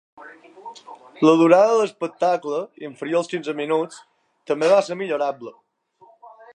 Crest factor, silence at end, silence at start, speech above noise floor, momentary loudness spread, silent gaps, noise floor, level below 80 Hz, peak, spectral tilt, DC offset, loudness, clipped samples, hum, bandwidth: 20 dB; 0.25 s; 0.2 s; 35 dB; 23 LU; none; -55 dBFS; -80 dBFS; -2 dBFS; -5.5 dB/octave; under 0.1%; -20 LUFS; under 0.1%; none; 10.5 kHz